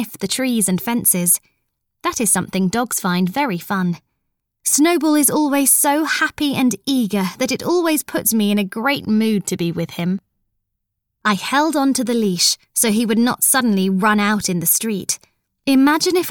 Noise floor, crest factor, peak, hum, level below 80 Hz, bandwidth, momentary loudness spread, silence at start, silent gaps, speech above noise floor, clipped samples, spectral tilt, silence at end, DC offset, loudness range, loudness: -76 dBFS; 16 dB; -2 dBFS; none; -58 dBFS; 20 kHz; 8 LU; 0 s; none; 59 dB; under 0.1%; -3.5 dB/octave; 0 s; under 0.1%; 4 LU; -17 LUFS